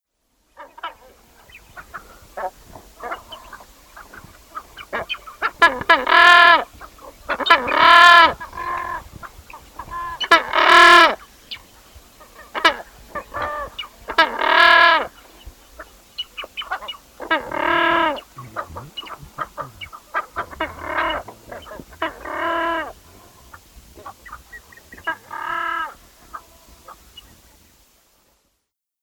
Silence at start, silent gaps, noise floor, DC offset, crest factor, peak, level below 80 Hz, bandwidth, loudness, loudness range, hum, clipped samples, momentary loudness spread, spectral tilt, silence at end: 0.6 s; none; -75 dBFS; under 0.1%; 20 dB; 0 dBFS; -50 dBFS; over 20 kHz; -15 LUFS; 19 LU; none; under 0.1%; 26 LU; -2 dB/octave; 2.1 s